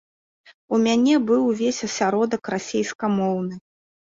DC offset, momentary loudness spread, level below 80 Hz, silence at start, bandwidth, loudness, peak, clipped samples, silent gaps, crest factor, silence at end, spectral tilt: under 0.1%; 8 LU; -64 dBFS; 0.7 s; 7.8 kHz; -22 LUFS; -8 dBFS; under 0.1%; 2.95-2.99 s; 14 dB; 0.55 s; -5 dB/octave